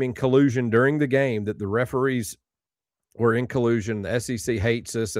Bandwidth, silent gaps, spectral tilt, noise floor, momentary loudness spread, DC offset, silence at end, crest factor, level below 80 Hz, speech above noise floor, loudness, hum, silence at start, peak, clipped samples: 16 kHz; none; -6 dB/octave; under -90 dBFS; 7 LU; under 0.1%; 0 s; 18 dB; -54 dBFS; over 67 dB; -23 LUFS; none; 0 s; -6 dBFS; under 0.1%